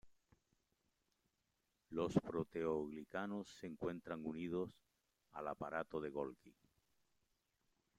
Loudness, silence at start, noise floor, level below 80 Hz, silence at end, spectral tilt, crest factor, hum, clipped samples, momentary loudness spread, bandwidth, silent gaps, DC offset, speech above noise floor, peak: -45 LUFS; 0.05 s; -86 dBFS; -76 dBFS; 1.45 s; -7 dB/octave; 26 dB; none; under 0.1%; 10 LU; 14.5 kHz; none; under 0.1%; 42 dB; -20 dBFS